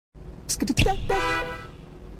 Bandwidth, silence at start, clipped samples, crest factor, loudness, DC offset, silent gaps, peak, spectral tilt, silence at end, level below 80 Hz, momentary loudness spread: 16.5 kHz; 0.15 s; under 0.1%; 18 dB; -25 LUFS; under 0.1%; none; -10 dBFS; -4 dB/octave; 0 s; -34 dBFS; 20 LU